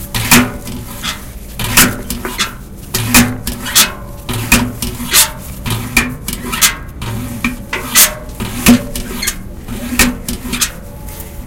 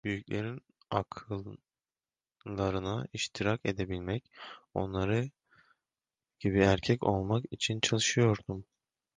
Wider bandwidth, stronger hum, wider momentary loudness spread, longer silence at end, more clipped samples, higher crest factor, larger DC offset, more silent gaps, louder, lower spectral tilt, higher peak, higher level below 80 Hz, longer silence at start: first, over 20 kHz vs 10 kHz; neither; about the same, 17 LU vs 15 LU; second, 0 s vs 0.55 s; first, 0.6% vs under 0.1%; second, 16 dB vs 22 dB; neither; neither; first, -13 LUFS vs -32 LUFS; second, -2.5 dB/octave vs -5 dB/octave; first, 0 dBFS vs -10 dBFS; first, -28 dBFS vs -54 dBFS; about the same, 0 s vs 0.05 s